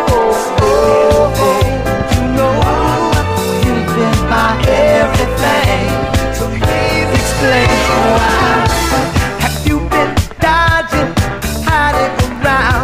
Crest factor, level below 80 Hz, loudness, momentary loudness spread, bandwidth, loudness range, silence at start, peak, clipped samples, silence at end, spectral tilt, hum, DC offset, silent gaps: 12 dB; -22 dBFS; -12 LUFS; 5 LU; 15.5 kHz; 1 LU; 0 s; 0 dBFS; under 0.1%; 0 s; -5 dB/octave; none; under 0.1%; none